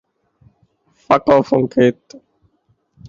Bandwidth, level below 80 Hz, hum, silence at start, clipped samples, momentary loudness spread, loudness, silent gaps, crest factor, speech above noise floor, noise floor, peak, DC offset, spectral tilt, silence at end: 7.4 kHz; -54 dBFS; none; 1.1 s; under 0.1%; 4 LU; -15 LUFS; none; 18 dB; 48 dB; -63 dBFS; -2 dBFS; under 0.1%; -7.5 dB/octave; 1.15 s